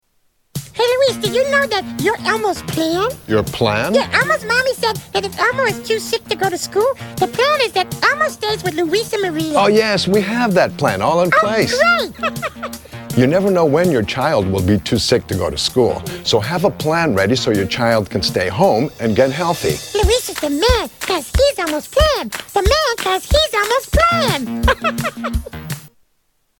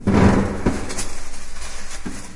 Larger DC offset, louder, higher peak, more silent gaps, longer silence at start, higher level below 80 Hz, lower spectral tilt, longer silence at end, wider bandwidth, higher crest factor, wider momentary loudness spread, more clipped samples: neither; first, -16 LUFS vs -21 LUFS; first, 0 dBFS vs -4 dBFS; neither; first, 0.55 s vs 0 s; about the same, -30 dBFS vs -30 dBFS; second, -4.5 dB/octave vs -6 dB/octave; first, 0.7 s vs 0 s; first, 17.5 kHz vs 11.5 kHz; about the same, 16 dB vs 16 dB; second, 7 LU vs 19 LU; neither